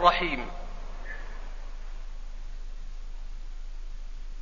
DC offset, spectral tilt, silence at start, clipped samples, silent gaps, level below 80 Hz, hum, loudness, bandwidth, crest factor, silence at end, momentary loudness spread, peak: 0.6%; -2 dB/octave; 0 s; under 0.1%; none; -36 dBFS; none; -37 LUFS; 7.2 kHz; 26 dB; 0 s; 14 LU; -6 dBFS